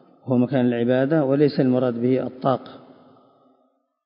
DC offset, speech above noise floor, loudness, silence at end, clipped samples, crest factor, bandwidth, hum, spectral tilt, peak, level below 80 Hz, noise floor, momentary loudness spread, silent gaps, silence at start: under 0.1%; 46 dB; -21 LUFS; 1.3 s; under 0.1%; 18 dB; 5.4 kHz; none; -12.5 dB/octave; -4 dBFS; -68 dBFS; -66 dBFS; 5 LU; none; 0.25 s